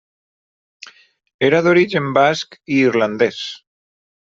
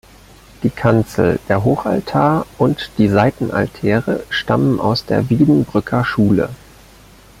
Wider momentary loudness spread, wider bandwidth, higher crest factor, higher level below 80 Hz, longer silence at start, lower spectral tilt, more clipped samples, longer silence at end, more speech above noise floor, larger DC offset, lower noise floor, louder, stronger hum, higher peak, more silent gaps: first, 13 LU vs 6 LU; second, 7.6 kHz vs 16 kHz; about the same, 16 dB vs 16 dB; second, -62 dBFS vs -42 dBFS; first, 0.85 s vs 0.6 s; second, -5.5 dB/octave vs -7.5 dB/octave; neither; about the same, 0.8 s vs 0.85 s; about the same, 27 dB vs 28 dB; neither; about the same, -43 dBFS vs -43 dBFS; about the same, -16 LUFS vs -16 LUFS; neither; about the same, -2 dBFS vs 0 dBFS; first, 1.34-1.39 s vs none